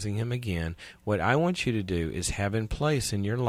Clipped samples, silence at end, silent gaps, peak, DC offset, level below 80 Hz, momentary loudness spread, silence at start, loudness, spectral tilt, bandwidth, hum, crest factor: under 0.1%; 0 s; none; -10 dBFS; under 0.1%; -44 dBFS; 7 LU; 0 s; -29 LUFS; -5.5 dB/octave; 15.5 kHz; none; 18 dB